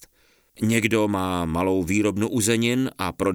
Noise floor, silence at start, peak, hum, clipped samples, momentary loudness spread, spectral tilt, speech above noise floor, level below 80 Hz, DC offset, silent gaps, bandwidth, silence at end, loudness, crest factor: -61 dBFS; 0.6 s; -4 dBFS; none; under 0.1%; 5 LU; -5 dB/octave; 39 dB; -52 dBFS; under 0.1%; none; over 20 kHz; 0 s; -23 LUFS; 20 dB